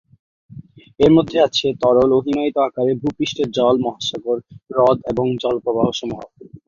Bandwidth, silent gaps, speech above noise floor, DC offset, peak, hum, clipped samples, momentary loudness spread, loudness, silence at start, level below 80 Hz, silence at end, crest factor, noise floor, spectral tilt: 7.4 kHz; none; 23 dB; under 0.1%; -2 dBFS; none; under 0.1%; 10 LU; -18 LUFS; 0.55 s; -50 dBFS; 0.1 s; 16 dB; -40 dBFS; -6 dB/octave